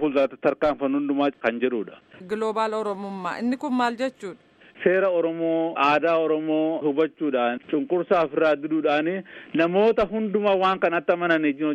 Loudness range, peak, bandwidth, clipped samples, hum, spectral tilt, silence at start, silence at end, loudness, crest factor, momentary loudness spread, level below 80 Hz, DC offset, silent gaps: 4 LU; -6 dBFS; 9.6 kHz; under 0.1%; none; -6.5 dB/octave; 0 s; 0 s; -23 LUFS; 16 dB; 9 LU; -60 dBFS; under 0.1%; none